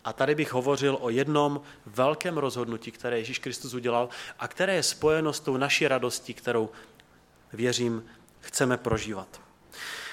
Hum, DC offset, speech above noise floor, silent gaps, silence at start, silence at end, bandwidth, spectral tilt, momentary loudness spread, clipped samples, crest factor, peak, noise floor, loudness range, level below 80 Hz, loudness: none; under 0.1%; 30 dB; none; 0.05 s; 0 s; 16.5 kHz; -4 dB/octave; 12 LU; under 0.1%; 20 dB; -8 dBFS; -58 dBFS; 4 LU; -58 dBFS; -28 LUFS